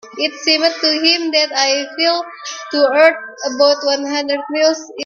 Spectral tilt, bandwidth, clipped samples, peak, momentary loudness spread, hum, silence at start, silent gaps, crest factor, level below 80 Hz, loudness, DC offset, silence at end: 0 dB/octave; 7.4 kHz; under 0.1%; 0 dBFS; 9 LU; none; 0.05 s; none; 16 dB; -68 dBFS; -15 LUFS; under 0.1%; 0 s